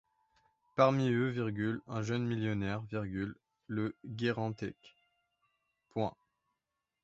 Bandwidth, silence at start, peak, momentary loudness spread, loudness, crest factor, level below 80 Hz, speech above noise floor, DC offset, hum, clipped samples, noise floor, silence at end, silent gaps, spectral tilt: 7.8 kHz; 0.75 s; -12 dBFS; 12 LU; -35 LUFS; 24 dB; -64 dBFS; 54 dB; under 0.1%; none; under 0.1%; -88 dBFS; 0.95 s; none; -6 dB/octave